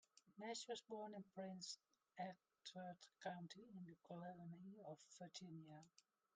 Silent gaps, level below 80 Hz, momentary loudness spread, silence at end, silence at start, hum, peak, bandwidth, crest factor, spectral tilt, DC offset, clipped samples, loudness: none; under -90 dBFS; 8 LU; 0.35 s; 0.15 s; none; -38 dBFS; 9.4 kHz; 20 dB; -4 dB/octave; under 0.1%; under 0.1%; -56 LUFS